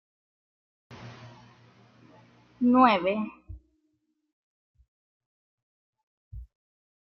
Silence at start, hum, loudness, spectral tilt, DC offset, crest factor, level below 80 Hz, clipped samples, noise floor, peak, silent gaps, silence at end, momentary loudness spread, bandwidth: 0.9 s; none; -24 LUFS; -7.5 dB/octave; under 0.1%; 26 dB; -56 dBFS; under 0.1%; -76 dBFS; -6 dBFS; 4.33-4.74 s, 4.88-5.20 s, 5.26-5.93 s, 6.03-6.31 s; 0.6 s; 28 LU; 6 kHz